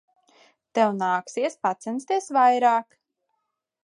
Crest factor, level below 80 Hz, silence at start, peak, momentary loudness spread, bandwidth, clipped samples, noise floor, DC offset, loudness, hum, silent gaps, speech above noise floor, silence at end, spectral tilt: 18 dB; -84 dBFS; 0.75 s; -8 dBFS; 10 LU; 11 kHz; under 0.1%; -79 dBFS; under 0.1%; -23 LUFS; none; none; 56 dB; 1.05 s; -4.5 dB/octave